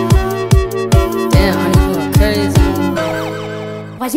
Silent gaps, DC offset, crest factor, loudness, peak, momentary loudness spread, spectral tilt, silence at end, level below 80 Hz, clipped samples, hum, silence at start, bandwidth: none; under 0.1%; 12 dB; -14 LUFS; 0 dBFS; 11 LU; -6 dB/octave; 0 s; -18 dBFS; under 0.1%; none; 0 s; 16.5 kHz